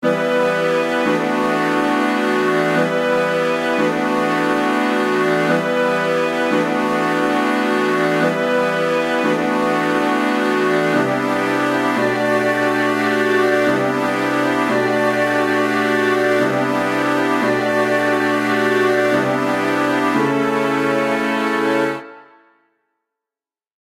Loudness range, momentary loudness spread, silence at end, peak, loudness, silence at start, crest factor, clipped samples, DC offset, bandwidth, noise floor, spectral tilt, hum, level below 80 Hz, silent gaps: 1 LU; 2 LU; 1.6 s; -4 dBFS; -17 LUFS; 0 s; 12 dB; under 0.1%; under 0.1%; 16 kHz; under -90 dBFS; -5 dB/octave; none; -62 dBFS; none